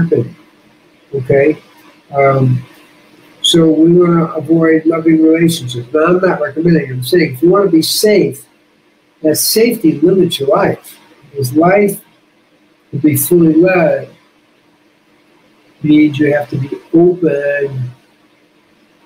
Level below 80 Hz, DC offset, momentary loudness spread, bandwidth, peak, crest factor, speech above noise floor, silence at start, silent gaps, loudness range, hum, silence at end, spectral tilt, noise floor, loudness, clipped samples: -54 dBFS; under 0.1%; 12 LU; 16 kHz; 0 dBFS; 12 dB; 41 dB; 0 s; none; 4 LU; none; 1.15 s; -5.5 dB/octave; -52 dBFS; -11 LUFS; under 0.1%